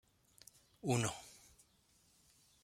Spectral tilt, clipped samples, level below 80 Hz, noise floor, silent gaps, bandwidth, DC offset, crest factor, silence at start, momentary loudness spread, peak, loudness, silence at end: -4.5 dB/octave; under 0.1%; -72 dBFS; -73 dBFS; none; 16 kHz; under 0.1%; 24 dB; 0.85 s; 25 LU; -22 dBFS; -40 LUFS; 1.3 s